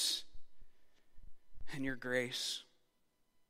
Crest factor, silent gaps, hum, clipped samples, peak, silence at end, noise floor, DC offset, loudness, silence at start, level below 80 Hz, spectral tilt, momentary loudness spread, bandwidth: 20 dB; none; none; under 0.1%; -22 dBFS; 0.85 s; -76 dBFS; under 0.1%; -39 LUFS; 0 s; -60 dBFS; -2 dB/octave; 8 LU; 16 kHz